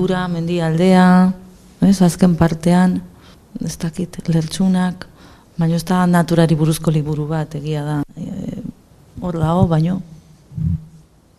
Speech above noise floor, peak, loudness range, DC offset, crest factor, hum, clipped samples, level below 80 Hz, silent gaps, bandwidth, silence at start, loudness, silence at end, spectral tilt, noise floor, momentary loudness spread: 31 dB; 0 dBFS; 6 LU; under 0.1%; 16 dB; none; under 0.1%; -40 dBFS; none; 13.5 kHz; 0 s; -17 LUFS; 0.5 s; -7 dB/octave; -47 dBFS; 14 LU